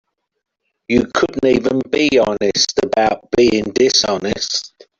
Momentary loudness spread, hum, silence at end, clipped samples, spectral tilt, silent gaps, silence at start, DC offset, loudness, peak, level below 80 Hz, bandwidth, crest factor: 6 LU; none; 0.3 s; under 0.1%; -3.5 dB/octave; none; 0.9 s; under 0.1%; -16 LUFS; -2 dBFS; -46 dBFS; 7.6 kHz; 16 dB